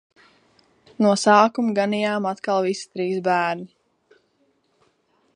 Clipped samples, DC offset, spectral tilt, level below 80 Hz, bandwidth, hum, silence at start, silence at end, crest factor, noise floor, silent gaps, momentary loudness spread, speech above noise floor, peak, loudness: under 0.1%; under 0.1%; -5 dB/octave; -74 dBFS; 11.5 kHz; none; 1 s; 1.7 s; 22 dB; -66 dBFS; none; 11 LU; 46 dB; -2 dBFS; -21 LUFS